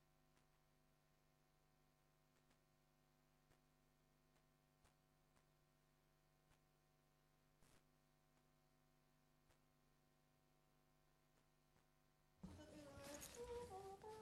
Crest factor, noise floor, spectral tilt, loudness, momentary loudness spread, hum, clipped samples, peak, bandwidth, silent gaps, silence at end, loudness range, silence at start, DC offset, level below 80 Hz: 26 dB; -81 dBFS; -4 dB/octave; -59 LUFS; 8 LU; none; under 0.1%; -42 dBFS; 12.5 kHz; none; 0 s; 8 LU; 0 s; under 0.1%; -80 dBFS